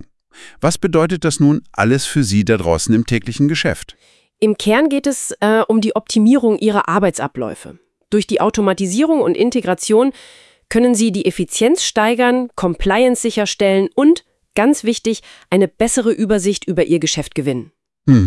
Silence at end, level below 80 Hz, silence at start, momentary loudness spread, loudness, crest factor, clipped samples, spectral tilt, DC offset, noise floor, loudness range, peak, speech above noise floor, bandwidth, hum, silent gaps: 0 s; -42 dBFS; 0 s; 6 LU; -16 LUFS; 16 dB; under 0.1%; -5 dB/octave; under 0.1%; -42 dBFS; 2 LU; 0 dBFS; 27 dB; 12 kHz; none; none